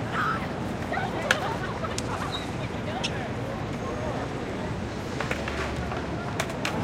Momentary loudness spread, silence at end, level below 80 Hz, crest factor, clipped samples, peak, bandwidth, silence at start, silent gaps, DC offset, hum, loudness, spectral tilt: 6 LU; 0 s; -44 dBFS; 26 dB; under 0.1%; -2 dBFS; 16.5 kHz; 0 s; none; under 0.1%; none; -30 LUFS; -5 dB/octave